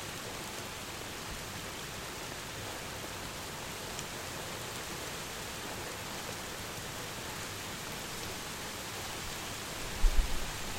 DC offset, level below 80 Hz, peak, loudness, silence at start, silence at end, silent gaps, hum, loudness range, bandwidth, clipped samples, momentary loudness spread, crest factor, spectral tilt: under 0.1%; -42 dBFS; -14 dBFS; -39 LUFS; 0 s; 0 s; none; none; 2 LU; 16.5 kHz; under 0.1%; 3 LU; 24 dB; -2.5 dB/octave